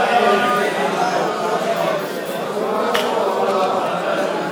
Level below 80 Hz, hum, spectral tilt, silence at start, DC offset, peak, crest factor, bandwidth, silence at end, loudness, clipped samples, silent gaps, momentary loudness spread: -70 dBFS; none; -4 dB/octave; 0 s; under 0.1%; -2 dBFS; 16 dB; 19.5 kHz; 0 s; -19 LUFS; under 0.1%; none; 7 LU